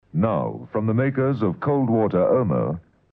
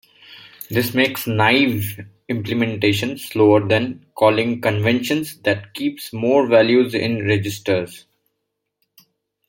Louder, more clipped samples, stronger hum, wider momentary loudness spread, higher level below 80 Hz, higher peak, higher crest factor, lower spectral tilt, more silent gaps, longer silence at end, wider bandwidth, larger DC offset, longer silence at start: second, -22 LUFS vs -18 LUFS; neither; neither; second, 7 LU vs 11 LU; about the same, -56 dBFS vs -60 dBFS; second, -8 dBFS vs -2 dBFS; about the same, 14 dB vs 18 dB; first, -12 dB/octave vs -5.5 dB/octave; neither; second, 0.3 s vs 1.5 s; second, 4.8 kHz vs 17 kHz; neither; second, 0.15 s vs 0.3 s